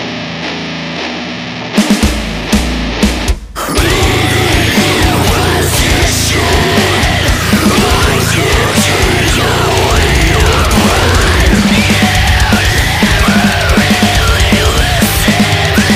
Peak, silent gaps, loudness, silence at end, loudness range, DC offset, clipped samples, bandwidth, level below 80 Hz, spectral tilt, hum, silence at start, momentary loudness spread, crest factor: 0 dBFS; none; -10 LUFS; 0 s; 4 LU; under 0.1%; under 0.1%; 16 kHz; -18 dBFS; -4 dB/octave; none; 0 s; 8 LU; 10 dB